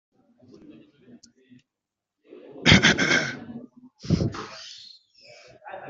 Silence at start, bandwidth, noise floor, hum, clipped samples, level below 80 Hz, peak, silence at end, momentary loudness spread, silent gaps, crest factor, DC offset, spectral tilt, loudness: 2.35 s; 7.8 kHz; -86 dBFS; none; under 0.1%; -46 dBFS; 0 dBFS; 0 s; 26 LU; none; 26 dB; under 0.1%; -4 dB/octave; -20 LUFS